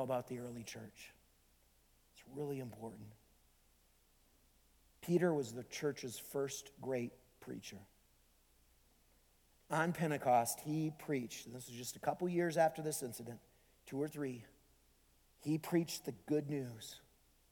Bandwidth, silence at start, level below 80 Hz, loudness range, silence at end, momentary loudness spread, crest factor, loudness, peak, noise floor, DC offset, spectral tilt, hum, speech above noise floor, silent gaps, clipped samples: 19 kHz; 0 s; -74 dBFS; 13 LU; 0.55 s; 19 LU; 22 dB; -40 LUFS; -20 dBFS; -72 dBFS; under 0.1%; -5.5 dB/octave; none; 32 dB; none; under 0.1%